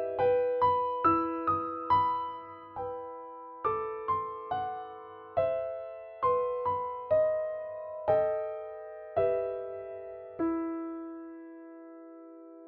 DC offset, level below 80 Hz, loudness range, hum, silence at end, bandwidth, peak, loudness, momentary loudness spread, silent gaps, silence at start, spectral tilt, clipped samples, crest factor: under 0.1%; -66 dBFS; 5 LU; none; 0 s; 5.4 kHz; -14 dBFS; -31 LUFS; 18 LU; none; 0 s; -5.5 dB/octave; under 0.1%; 18 dB